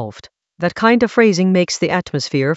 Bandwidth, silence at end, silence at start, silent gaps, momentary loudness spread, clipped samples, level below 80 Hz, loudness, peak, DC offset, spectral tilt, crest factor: 8.2 kHz; 0 s; 0 s; none; 10 LU; under 0.1%; -54 dBFS; -15 LUFS; 0 dBFS; under 0.1%; -5.5 dB/octave; 16 dB